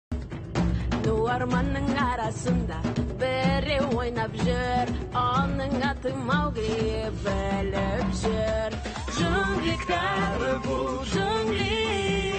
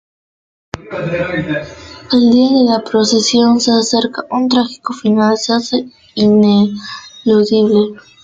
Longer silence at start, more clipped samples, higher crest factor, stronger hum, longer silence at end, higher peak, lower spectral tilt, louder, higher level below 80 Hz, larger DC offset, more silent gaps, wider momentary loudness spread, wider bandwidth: second, 0.1 s vs 0.75 s; neither; about the same, 14 dB vs 12 dB; neither; second, 0 s vs 0.25 s; second, -12 dBFS vs -2 dBFS; about the same, -6 dB/octave vs -5 dB/octave; second, -27 LUFS vs -13 LUFS; first, -36 dBFS vs -52 dBFS; neither; neither; second, 4 LU vs 15 LU; about the same, 8.8 kHz vs 9 kHz